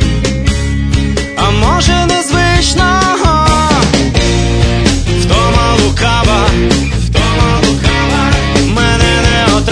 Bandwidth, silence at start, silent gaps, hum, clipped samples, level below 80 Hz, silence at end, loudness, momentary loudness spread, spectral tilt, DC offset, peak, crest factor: 10.5 kHz; 0 s; none; none; 0.2%; -16 dBFS; 0 s; -10 LUFS; 4 LU; -4.5 dB/octave; under 0.1%; 0 dBFS; 10 dB